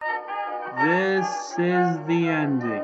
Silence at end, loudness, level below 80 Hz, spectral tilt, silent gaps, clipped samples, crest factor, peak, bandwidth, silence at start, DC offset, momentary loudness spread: 0 s; -24 LUFS; -80 dBFS; -6 dB/octave; none; under 0.1%; 14 dB; -8 dBFS; 8 kHz; 0 s; under 0.1%; 8 LU